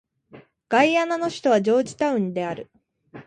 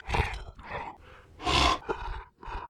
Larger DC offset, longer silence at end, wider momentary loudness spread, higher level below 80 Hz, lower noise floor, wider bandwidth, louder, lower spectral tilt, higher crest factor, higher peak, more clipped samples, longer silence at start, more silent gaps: neither; about the same, 0.05 s vs 0 s; second, 10 LU vs 18 LU; second, -66 dBFS vs -38 dBFS; about the same, -50 dBFS vs -51 dBFS; second, 10.5 kHz vs 13.5 kHz; first, -22 LUFS vs -29 LUFS; first, -5 dB/octave vs -3.5 dB/octave; about the same, 18 dB vs 22 dB; first, -6 dBFS vs -10 dBFS; neither; first, 0.35 s vs 0.05 s; neither